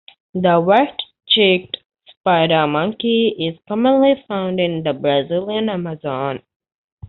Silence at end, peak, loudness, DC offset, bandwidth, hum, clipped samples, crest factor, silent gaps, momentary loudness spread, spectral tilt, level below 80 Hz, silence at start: 0 s; -2 dBFS; -17 LUFS; under 0.1%; 4.4 kHz; none; under 0.1%; 16 dB; 1.86-1.90 s, 2.17-2.24 s, 6.56-6.60 s, 6.75-6.98 s; 11 LU; -3.5 dB/octave; -58 dBFS; 0.35 s